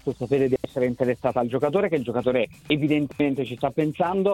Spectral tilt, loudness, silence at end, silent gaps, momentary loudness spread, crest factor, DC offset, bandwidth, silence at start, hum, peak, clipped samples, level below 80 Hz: -7.5 dB/octave; -24 LUFS; 0 s; none; 3 LU; 16 dB; under 0.1%; 16 kHz; 0.05 s; none; -6 dBFS; under 0.1%; -56 dBFS